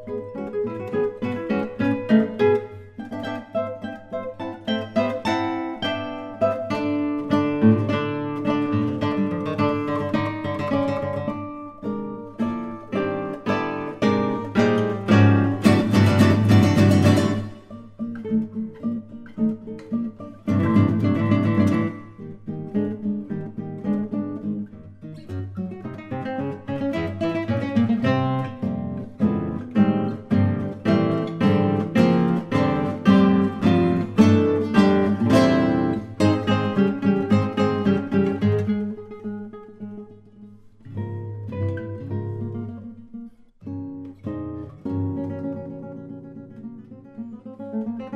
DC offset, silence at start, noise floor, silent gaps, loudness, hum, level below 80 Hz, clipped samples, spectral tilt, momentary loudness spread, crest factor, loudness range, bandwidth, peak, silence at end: under 0.1%; 0 s; -46 dBFS; none; -22 LUFS; none; -54 dBFS; under 0.1%; -7.5 dB/octave; 18 LU; 18 dB; 13 LU; 13 kHz; -4 dBFS; 0 s